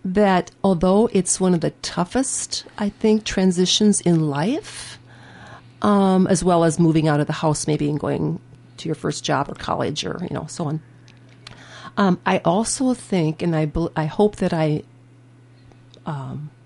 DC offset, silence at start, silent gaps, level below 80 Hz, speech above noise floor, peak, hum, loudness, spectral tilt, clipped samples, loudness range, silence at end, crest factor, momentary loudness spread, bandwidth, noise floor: under 0.1%; 0.05 s; none; -46 dBFS; 29 dB; -4 dBFS; none; -20 LUFS; -5 dB/octave; under 0.1%; 6 LU; 0.15 s; 16 dB; 13 LU; 11.5 kHz; -49 dBFS